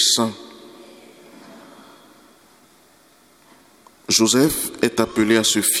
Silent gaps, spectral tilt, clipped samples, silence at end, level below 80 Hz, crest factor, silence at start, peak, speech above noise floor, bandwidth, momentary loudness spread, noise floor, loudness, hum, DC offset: none; -2.5 dB/octave; under 0.1%; 0 s; -54 dBFS; 20 dB; 0 s; -2 dBFS; 35 dB; 18.5 kHz; 21 LU; -54 dBFS; -17 LUFS; none; under 0.1%